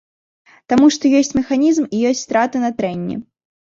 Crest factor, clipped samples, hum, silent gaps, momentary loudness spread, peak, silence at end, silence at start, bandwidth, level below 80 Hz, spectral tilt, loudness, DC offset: 14 dB; under 0.1%; none; none; 10 LU; -2 dBFS; 0.4 s; 0.7 s; 7.6 kHz; -52 dBFS; -4.5 dB/octave; -16 LUFS; under 0.1%